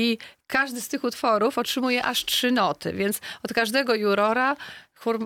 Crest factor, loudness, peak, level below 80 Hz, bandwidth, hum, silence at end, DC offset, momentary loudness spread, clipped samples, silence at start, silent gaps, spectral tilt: 16 dB; -24 LUFS; -8 dBFS; -64 dBFS; 19 kHz; none; 0 s; under 0.1%; 8 LU; under 0.1%; 0 s; none; -3 dB/octave